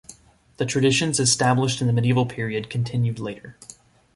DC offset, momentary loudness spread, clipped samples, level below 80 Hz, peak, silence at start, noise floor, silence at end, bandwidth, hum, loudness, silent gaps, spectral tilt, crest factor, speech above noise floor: under 0.1%; 13 LU; under 0.1%; -56 dBFS; -6 dBFS; 0.1 s; -49 dBFS; 0.45 s; 11.5 kHz; none; -22 LUFS; none; -4.5 dB/octave; 16 dB; 27 dB